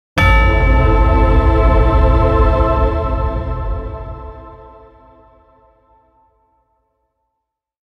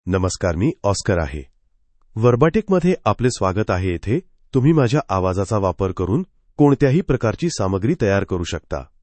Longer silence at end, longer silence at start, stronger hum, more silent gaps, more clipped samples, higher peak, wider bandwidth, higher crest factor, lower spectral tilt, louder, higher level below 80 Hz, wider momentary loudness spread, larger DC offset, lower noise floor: first, 3.3 s vs 0.2 s; about the same, 0.15 s vs 0.05 s; neither; neither; neither; about the same, 0 dBFS vs -2 dBFS; second, 6.4 kHz vs 8.8 kHz; about the same, 14 dB vs 18 dB; first, -8 dB/octave vs -6.5 dB/octave; first, -14 LUFS vs -19 LUFS; first, -16 dBFS vs -40 dBFS; first, 17 LU vs 9 LU; neither; first, -76 dBFS vs -59 dBFS